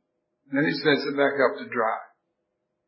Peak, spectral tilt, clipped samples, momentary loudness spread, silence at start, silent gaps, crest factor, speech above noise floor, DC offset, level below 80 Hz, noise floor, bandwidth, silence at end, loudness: -6 dBFS; -9 dB/octave; under 0.1%; 7 LU; 0.5 s; none; 20 dB; 55 dB; under 0.1%; -82 dBFS; -78 dBFS; 5.8 kHz; 0.8 s; -24 LUFS